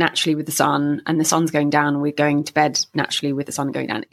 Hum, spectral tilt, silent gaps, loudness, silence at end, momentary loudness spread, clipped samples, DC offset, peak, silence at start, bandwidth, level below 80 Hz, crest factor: none; -4 dB/octave; none; -20 LUFS; 0.1 s; 6 LU; under 0.1%; under 0.1%; -2 dBFS; 0 s; 15 kHz; -66 dBFS; 18 dB